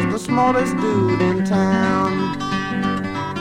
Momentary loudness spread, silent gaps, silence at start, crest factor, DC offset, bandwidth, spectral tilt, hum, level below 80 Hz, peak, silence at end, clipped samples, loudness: 5 LU; none; 0 s; 14 dB; under 0.1%; 12 kHz; -6.5 dB/octave; none; -46 dBFS; -4 dBFS; 0 s; under 0.1%; -19 LUFS